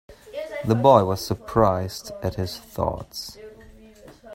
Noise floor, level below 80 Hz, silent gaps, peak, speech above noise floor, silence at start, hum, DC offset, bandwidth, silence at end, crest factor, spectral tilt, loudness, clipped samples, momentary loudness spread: -47 dBFS; -46 dBFS; none; -2 dBFS; 26 dB; 0.1 s; none; under 0.1%; 16 kHz; 0 s; 22 dB; -6.5 dB/octave; -23 LUFS; under 0.1%; 19 LU